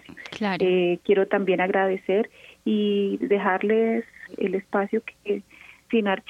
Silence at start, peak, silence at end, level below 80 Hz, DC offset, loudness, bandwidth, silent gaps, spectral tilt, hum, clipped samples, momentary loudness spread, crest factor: 0.1 s; -8 dBFS; 0.1 s; -68 dBFS; under 0.1%; -24 LUFS; 7.8 kHz; none; -7.5 dB/octave; none; under 0.1%; 9 LU; 16 dB